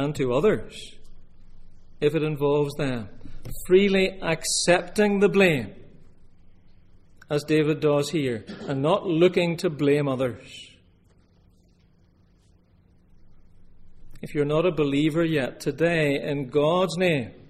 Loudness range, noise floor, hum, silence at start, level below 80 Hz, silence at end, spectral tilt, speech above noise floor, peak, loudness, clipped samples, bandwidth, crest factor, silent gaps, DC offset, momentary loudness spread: 7 LU; -58 dBFS; none; 0 s; -46 dBFS; 0.15 s; -5.5 dB/octave; 35 dB; -6 dBFS; -23 LUFS; under 0.1%; 15.5 kHz; 20 dB; none; under 0.1%; 16 LU